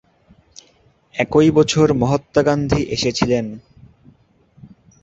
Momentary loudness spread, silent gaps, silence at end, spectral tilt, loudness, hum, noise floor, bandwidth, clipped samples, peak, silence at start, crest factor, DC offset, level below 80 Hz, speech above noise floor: 12 LU; none; 0.35 s; -5.5 dB/octave; -17 LUFS; none; -56 dBFS; 8 kHz; under 0.1%; -2 dBFS; 1.15 s; 18 dB; under 0.1%; -42 dBFS; 40 dB